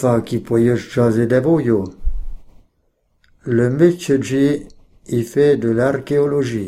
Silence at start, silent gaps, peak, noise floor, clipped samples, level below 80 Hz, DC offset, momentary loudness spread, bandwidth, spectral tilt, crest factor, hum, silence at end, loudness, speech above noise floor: 0 s; none; -2 dBFS; -63 dBFS; under 0.1%; -34 dBFS; under 0.1%; 10 LU; 14 kHz; -7.5 dB/octave; 16 dB; none; 0 s; -17 LUFS; 48 dB